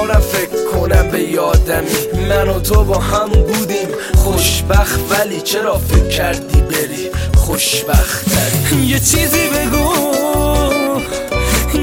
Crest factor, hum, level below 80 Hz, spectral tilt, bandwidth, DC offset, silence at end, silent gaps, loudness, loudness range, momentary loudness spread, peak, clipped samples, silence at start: 14 dB; none; -18 dBFS; -4.5 dB/octave; 17 kHz; under 0.1%; 0 s; none; -14 LUFS; 1 LU; 5 LU; 0 dBFS; under 0.1%; 0 s